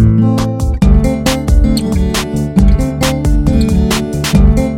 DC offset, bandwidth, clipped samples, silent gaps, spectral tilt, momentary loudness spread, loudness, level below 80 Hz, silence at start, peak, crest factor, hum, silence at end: under 0.1%; 16 kHz; 0.3%; none; -6 dB/octave; 4 LU; -12 LUFS; -14 dBFS; 0 s; 0 dBFS; 10 dB; none; 0 s